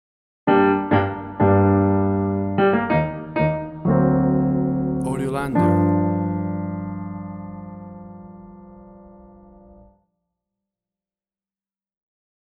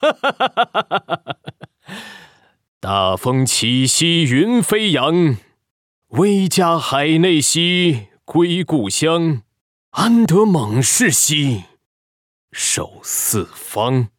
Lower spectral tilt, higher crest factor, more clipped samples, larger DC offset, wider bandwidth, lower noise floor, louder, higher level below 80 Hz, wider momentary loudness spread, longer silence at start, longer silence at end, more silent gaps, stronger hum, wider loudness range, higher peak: first, -9 dB/octave vs -4 dB/octave; about the same, 18 dB vs 14 dB; neither; neither; second, 12 kHz vs 18 kHz; first, under -90 dBFS vs -49 dBFS; second, -20 LUFS vs -16 LUFS; first, -46 dBFS vs -58 dBFS; first, 18 LU vs 13 LU; first, 0.45 s vs 0 s; first, 3.15 s vs 0.1 s; second, none vs 2.68-2.81 s, 5.71-6.02 s, 9.61-9.92 s, 11.86-12.48 s; neither; first, 18 LU vs 3 LU; about the same, -4 dBFS vs -4 dBFS